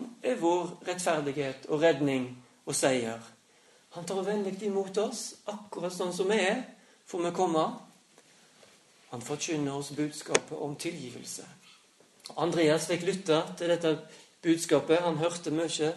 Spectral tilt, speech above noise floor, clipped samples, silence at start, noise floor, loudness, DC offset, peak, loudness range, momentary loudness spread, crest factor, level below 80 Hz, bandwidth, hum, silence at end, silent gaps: -4 dB/octave; 32 dB; under 0.1%; 0 s; -62 dBFS; -30 LUFS; under 0.1%; -2 dBFS; 6 LU; 15 LU; 28 dB; -76 dBFS; 12 kHz; none; 0 s; none